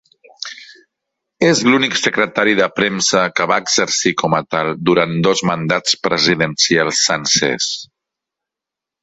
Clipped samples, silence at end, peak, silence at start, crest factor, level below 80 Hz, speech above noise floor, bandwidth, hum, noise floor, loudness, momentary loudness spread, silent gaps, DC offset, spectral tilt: under 0.1%; 1.2 s; 0 dBFS; 0.4 s; 16 dB; -56 dBFS; 70 dB; 8.2 kHz; none; -85 dBFS; -15 LUFS; 6 LU; none; under 0.1%; -3 dB/octave